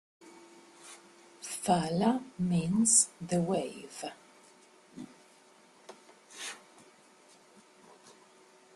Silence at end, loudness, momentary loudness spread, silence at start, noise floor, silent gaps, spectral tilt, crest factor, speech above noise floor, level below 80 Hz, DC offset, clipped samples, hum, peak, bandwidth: 2.2 s; -30 LUFS; 28 LU; 0.25 s; -61 dBFS; none; -4 dB/octave; 24 dB; 31 dB; -70 dBFS; under 0.1%; under 0.1%; none; -10 dBFS; 13 kHz